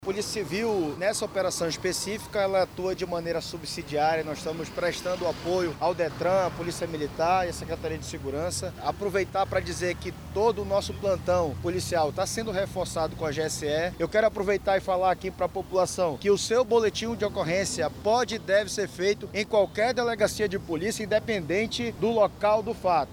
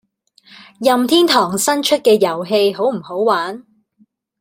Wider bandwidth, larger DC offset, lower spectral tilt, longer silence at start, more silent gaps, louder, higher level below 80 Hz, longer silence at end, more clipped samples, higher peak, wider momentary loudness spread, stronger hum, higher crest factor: first, over 20 kHz vs 16.5 kHz; neither; about the same, -4 dB/octave vs -3.5 dB/octave; second, 0 s vs 0.8 s; neither; second, -27 LUFS vs -15 LUFS; first, -50 dBFS vs -64 dBFS; second, 0 s vs 0.8 s; neither; second, -10 dBFS vs -2 dBFS; about the same, 7 LU vs 7 LU; neither; about the same, 16 dB vs 16 dB